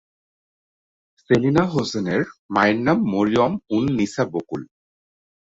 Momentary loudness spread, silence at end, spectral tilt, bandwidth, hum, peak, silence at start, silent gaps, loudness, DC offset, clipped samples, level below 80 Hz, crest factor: 7 LU; 0.95 s; -6.5 dB/octave; 8 kHz; none; -2 dBFS; 1.3 s; 2.39-2.49 s; -21 LUFS; under 0.1%; under 0.1%; -54 dBFS; 20 dB